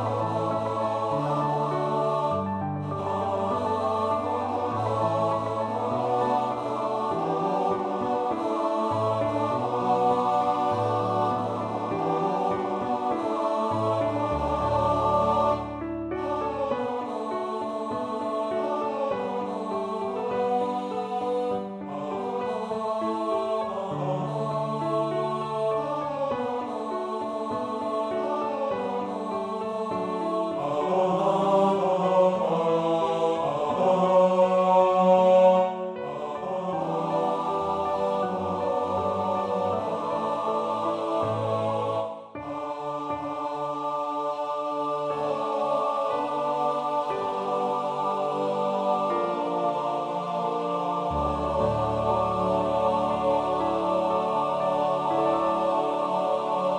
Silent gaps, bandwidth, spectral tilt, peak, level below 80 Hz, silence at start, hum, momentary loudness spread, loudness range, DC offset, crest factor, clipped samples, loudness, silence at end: none; 9.8 kHz; -7 dB/octave; -8 dBFS; -52 dBFS; 0 s; none; 7 LU; 6 LU; under 0.1%; 18 dB; under 0.1%; -26 LUFS; 0 s